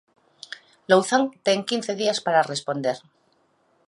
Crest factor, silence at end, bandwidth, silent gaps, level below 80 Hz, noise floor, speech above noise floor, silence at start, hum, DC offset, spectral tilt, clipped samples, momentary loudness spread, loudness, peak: 22 dB; 0.9 s; 11.5 kHz; none; -76 dBFS; -65 dBFS; 43 dB; 0.5 s; none; under 0.1%; -3.5 dB/octave; under 0.1%; 20 LU; -22 LUFS; -4 dBFS